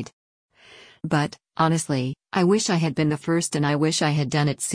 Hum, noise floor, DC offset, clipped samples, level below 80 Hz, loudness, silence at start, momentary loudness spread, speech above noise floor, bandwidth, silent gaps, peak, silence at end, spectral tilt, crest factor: none; -50 dBFS; under 0.1%; under 0.1%; -60 dBFS; -23 LUFS; 0 s; 6 LU; 27 dB; 10.5 kHz; 0.13-0.49 s; -6 dBFS; 0 s; -5 dB/octave; 18 dB